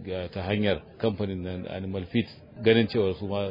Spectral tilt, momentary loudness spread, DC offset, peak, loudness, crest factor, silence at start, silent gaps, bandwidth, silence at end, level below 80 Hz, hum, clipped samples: -9.5 dB/octave; 12 LU; under 0.1%; -6 dBFS; -28 LUFS; 20 dB; 0 s; none; 5.4 kHz; 0 s; -58 dBFS; none; under 0.1%